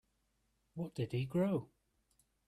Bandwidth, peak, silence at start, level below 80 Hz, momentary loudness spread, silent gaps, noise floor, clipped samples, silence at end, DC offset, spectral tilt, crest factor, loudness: 13.5 kHz; -24 dBFS; 0.75 s; -72 dBFS; 11 LU; none; -80 dBFS; under 0.1%; 0.8 s; under 0.1%; -8.5 dB/octave; 16 dB; -38 LUFS